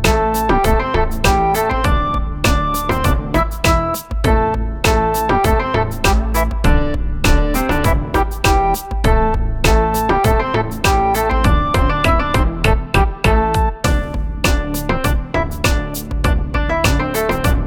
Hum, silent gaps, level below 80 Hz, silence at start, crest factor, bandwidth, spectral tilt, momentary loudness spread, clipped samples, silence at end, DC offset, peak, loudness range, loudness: none; none; -18 dBFS; 0 s; 14 dB; 19.5 kHz; -5 dB/octave; 4 LU; under 0.1%; 0 s; under 0.1%; 0 dBFS; 2 LU; -16 LUFS